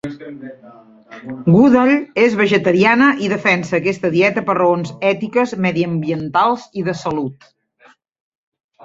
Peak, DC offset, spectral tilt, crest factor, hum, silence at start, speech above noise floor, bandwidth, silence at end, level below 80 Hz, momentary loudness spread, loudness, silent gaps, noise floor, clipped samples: -2 dBFS; under 0.1%; -7 dB/octave; 16 dB; none; 0.05 s; 36 dB; 7.8 kHz; 1.5 s; -56 dBFS; 17 LU; -15 LUFS; none; -52 dBFS; under 0.1%